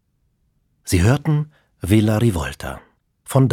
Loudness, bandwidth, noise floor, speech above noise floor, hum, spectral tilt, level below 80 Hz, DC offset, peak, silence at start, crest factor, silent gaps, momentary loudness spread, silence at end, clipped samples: -19 LUFS; 16.5 kHz; -66 dBFS; 48 dB; none; -6.5 dB/octave; -38 dBFS; under 0.1%; -2 dBFS; 0.85 s; 18 dB; none; 16 LU; 0 s; under 0.1%